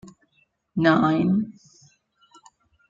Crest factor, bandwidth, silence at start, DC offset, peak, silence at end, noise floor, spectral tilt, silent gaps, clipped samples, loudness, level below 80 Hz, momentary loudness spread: 20 dB; 7.6 kHz; 0.05 s; under 0.1%; -6 dBFS; 1.4 s; -67 dBFS; -7.5 dB/octave; none; under 0.1%; -21 LUFS; -60 dBFS; 14 LU